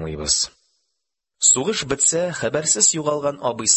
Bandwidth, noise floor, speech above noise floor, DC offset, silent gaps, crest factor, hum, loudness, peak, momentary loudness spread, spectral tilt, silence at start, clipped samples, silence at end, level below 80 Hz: 8.6 kHz; -79 dBFS; 59 dB; under 0.1%; none; 18 dB; none; -18 LUFS; -2 dBFS; 8 LU; -1.5 dB/octave; 0 s; under 0.1%; 0 s; -48 dBFS